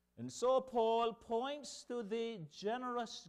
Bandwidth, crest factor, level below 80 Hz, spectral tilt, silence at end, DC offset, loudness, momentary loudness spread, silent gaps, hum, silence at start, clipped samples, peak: 12 kHz; 16 dB; -76 dBFS; -4 dB/octave; 0 s; under 0.1%; -39 LUFS; 10 LU; none; none; 0.2 s; under 0.1%; -24 dBFS